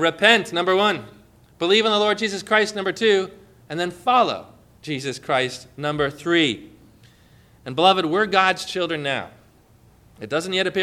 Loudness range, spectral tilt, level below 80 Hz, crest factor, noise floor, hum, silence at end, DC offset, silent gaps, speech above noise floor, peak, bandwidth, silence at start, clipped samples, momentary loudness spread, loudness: 4 LU; -4 dB/octave; -58 dBFS; 20 dB; -53 dBFS; none; 0 s; under 0.1%; none; 33 dB; -2 dBFS; 14 kHz; 0 s; under 0.1%; 14 LU; -20 LUFS